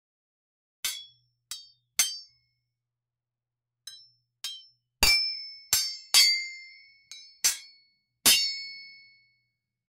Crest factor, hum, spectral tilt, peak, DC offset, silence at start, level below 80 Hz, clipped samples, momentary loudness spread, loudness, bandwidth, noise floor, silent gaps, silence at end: 26 dB; none; 1.5 dB/octave; -6 dBFS; under 0.1%; 0.85 s; -54 dBFS; under 0.1%; 24 LU; -24 LUFS; over 20 kHz; -90 dBFS; none; 1.1 s